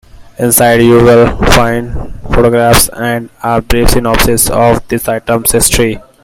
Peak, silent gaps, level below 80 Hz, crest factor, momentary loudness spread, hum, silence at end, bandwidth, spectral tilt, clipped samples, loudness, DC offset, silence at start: 0 dBFS; none; -20 dBFS; 8 dB; 10 LU; none; 0.25 s; over 20 kHz; -4 dB/octave; 0.8%; -9 LUFS; under 0.1%; 0.15 s